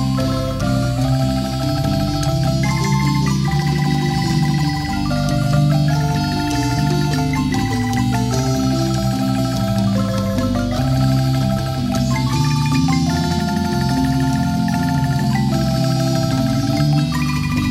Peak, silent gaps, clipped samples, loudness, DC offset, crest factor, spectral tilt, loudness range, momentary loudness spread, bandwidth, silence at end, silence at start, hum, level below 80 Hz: -4 dBFS; none; under 0.1%; -18 LUFS; under 0.1%; 12 dB; -6 dB/octave; 1 LU; 3 LU; 15.5 kHz; 0 s; 0 s; none; -32 dBFS